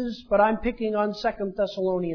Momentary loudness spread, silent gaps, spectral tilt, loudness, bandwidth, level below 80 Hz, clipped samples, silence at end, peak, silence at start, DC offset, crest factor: 6 LU; none; -7 dB/octave; -25 LUFS; 5.4 kHz; -46 dBFS; under 0.1%; 0 s; -8 dBFS; 0 s; under 0.1%; 18 dB